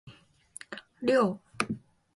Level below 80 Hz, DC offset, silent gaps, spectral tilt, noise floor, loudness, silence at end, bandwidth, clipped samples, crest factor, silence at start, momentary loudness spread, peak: -68 dBFS; under 0.1%; none; -5 dB/octave; -53 dBFS; -30 LUFS; 0.35 s; 11.5 kHz; under 0.1%; 24 dB; 0.05 s; 20 LU; -8 dBFS